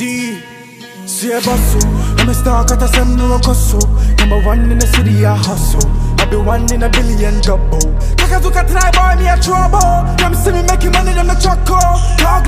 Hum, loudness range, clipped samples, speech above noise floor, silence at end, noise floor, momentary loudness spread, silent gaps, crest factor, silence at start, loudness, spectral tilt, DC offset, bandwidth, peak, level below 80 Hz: none; 2 LU; under 0.1%; 23 dB; 0 s; -33 dBFS; 4 LU; none; 10 dB; 0 s; -12 LUFS; -4.5 dB/octave; under 0.1%; 15.5 kHz; 0 dBFS; -12 dBFS